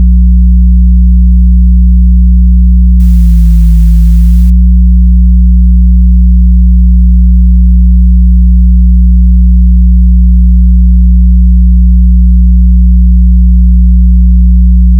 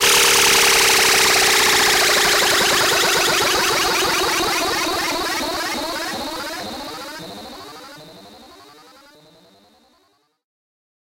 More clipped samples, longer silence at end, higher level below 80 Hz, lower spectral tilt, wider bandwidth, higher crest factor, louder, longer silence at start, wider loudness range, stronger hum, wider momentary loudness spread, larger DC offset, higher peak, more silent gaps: neither; second, 0 s vs 2.75 s; first, -4 dBFS vs -48 dBFS; first, -10.5 dB/octave vs -0.5 dB/octave; second, 0.2 kHz vs 16 kHz; second, 2 dB vs 16 dB; first, -6 LUFS vs -15 LUFS; about the same, 0 s vs 0 s; second, 0 LU vs 20 LU; neither; second, 0 LU vs 19 LU; neither; about the same, 0 dBFS vs -2 dBFS; neither